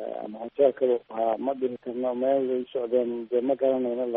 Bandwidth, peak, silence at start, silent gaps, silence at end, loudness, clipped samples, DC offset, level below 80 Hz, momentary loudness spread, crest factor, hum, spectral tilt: 3.9 kHz; -8 dBFS; 0 s; none; 0 s; -27 LUFS; under 0.1%; under 0.1%; -72 dBFS; 7 LU; 18 dB; none; -5 dB/octave